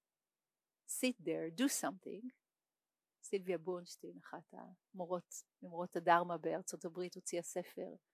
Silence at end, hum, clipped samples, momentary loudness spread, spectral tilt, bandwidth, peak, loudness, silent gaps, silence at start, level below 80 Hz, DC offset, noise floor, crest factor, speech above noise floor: 0.15 s; none; under 0.1%; 19 LU; -3.5 dB/octave; 16 kHz; -18 dBFS; -41 LUFS; none; 0.9 s; under -90 dBFS; under 0.1%; under -90 dBFS; 24 dB; over 49 dB